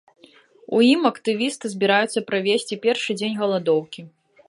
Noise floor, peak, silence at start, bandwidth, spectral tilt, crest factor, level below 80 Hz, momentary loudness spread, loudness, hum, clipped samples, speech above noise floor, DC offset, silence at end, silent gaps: -52 dBFS; -4 dBFS; 0.7 s; 11.5 kHz; -4.5 dB/octave; 18 dB; -74 dBFS; 8 LU; -21 LUFS; none; under 0.1%; 31 dB; under 0.1%; 0.4 s; none